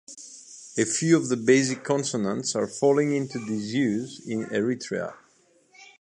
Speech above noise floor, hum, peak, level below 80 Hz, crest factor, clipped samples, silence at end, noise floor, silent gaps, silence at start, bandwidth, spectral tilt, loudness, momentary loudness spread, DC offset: 37 dB; none; -6 dBFS; -70 dBFS; 20 dB; under 0.1%; 0.15 s; -62 dBFS; none; 0.1 s; 11 kHz; -4.5 dB/octave; -25 LUFS; 13 LU; under 0.1%